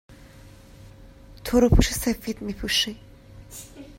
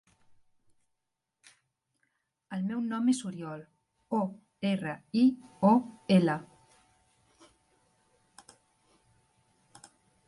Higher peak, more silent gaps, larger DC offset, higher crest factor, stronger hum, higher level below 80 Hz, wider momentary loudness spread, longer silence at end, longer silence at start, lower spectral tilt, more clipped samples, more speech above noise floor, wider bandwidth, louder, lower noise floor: first, -2 dBFS vs -12 dBFS; neither; neither; about the same, 24 dB vs 22 dB; neither; first, -32 dBFS vs -76 dBFS; first, 22 LU vs 14 LU; second, 0.05 s vs 3.8 s; second, 0.1 s vs 2.5 s; second, -4.5 dB/octave vs -6.5 dB/octave; neither; second, 25 dB vs 56 dB; first, 16.5 kHz vs 11.5 kHz; first, -23 LUFS vs -30 LUFS; second, -47 dBFS vs -84 dBFS